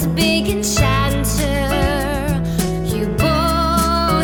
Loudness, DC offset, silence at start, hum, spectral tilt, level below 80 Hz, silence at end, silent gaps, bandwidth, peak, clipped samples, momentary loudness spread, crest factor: -17 LUFS; under 0.1%; 0 s; none; -5 dB/octave; -26 dBFS; 0 s; none; 18.5 kHz; -2 dBFS; under 0.1%; 4 LU; 14 dB